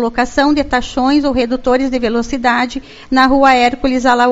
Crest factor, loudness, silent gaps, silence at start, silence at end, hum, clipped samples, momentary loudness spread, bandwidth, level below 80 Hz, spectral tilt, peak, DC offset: 12 dB; -13 LUFS; none; 0 s; 0 s; none; 0.1%; 7 LU; 8 kHz; -34 dBFS; -4 dB/octave; 0 dBFS; under 0.1%